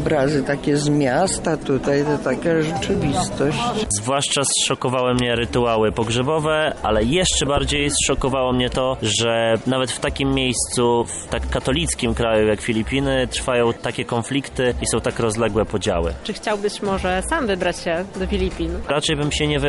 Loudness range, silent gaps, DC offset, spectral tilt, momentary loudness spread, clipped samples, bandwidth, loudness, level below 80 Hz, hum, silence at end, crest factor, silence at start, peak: 3 LU; none; under 0.1%; -4 dB/octave; 5 LU; under 0.1%; 11.5 kHz; -20 LUFS; -34 dBFS; none; 0 s; 12 dB; 0 s; -8 dBFS